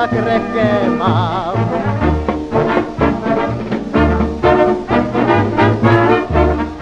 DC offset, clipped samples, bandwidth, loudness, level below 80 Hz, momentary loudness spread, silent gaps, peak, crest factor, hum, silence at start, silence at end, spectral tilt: under 0.1%; under 0.1%; 8.2 kHz; -15 LUFS; -28 dBFS; 5 LU; none; 0 dBFS; 14 dB; none; 0 s; 0 s; -8 dB/octave